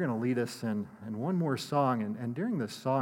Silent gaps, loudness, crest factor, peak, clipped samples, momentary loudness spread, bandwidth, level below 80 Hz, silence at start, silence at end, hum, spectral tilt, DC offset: none; -32 LUFS; 16 dB; -16 dBFS; under 0.1%; 7 LU; 17 kHz; -80 dBFS; 0 s; 0 s; none; -7 dB/octave; under 0.1%